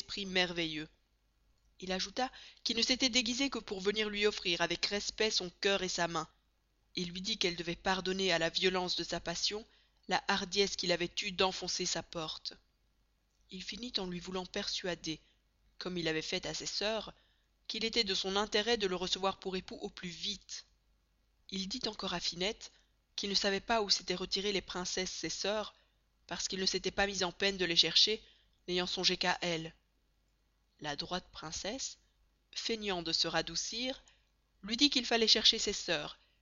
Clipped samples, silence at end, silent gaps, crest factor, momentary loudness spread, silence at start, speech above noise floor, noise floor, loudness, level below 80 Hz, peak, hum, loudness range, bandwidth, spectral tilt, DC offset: under 0.1%; 0.3 s; none; 26 dB; 14 LU; 0 s; 40 dB; -75 dBFS; -33 LUFS; -62 dBFS; -12 dBFS; none; 8 LU; 7.4 kHz; -1.5 dB/octave; under 0.1%